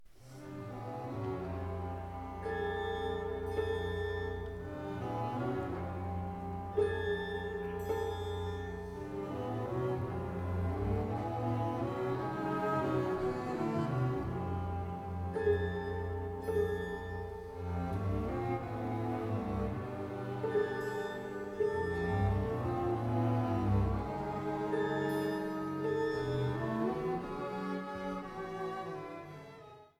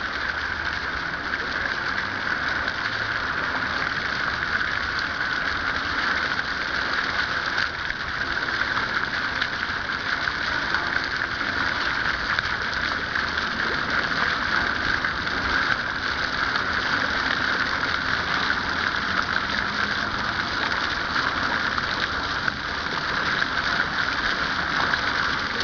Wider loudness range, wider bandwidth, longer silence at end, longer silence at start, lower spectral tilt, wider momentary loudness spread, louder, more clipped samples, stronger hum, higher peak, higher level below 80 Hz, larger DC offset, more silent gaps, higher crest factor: about the same, 4 LU vs 2 LU; first, 15.5 kHz vs 5.4 kHz; about the same, 0.1 s vs 0 s; about the same, 0 s vs 0 s; first, -8 dB/octave vs -3 dB/octave; first, 9 LU vs 3 LU; second, -37 LUFS vs -24 LUFS; neither; neither; second, -20 dBFS vs -6 dBFS; second, -50 dBFS vs -44 dBFS; second, under 0.1% vs 0.1%; neither; about the same, 16 dB vs 20 dB